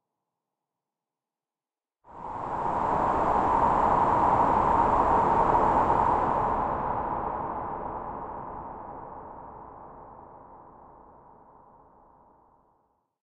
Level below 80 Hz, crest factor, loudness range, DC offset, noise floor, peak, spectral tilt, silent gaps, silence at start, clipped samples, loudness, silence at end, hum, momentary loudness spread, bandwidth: -46 dBFS; 18 dB; 19 LU; under 0.1%; under -90 dBFS; -10 dBFS; -7.5 dB/octave; none; 2.1 s; under 0.1%; -25 LUFS; 2.45 s; none; 20 LU; 8.4 kHz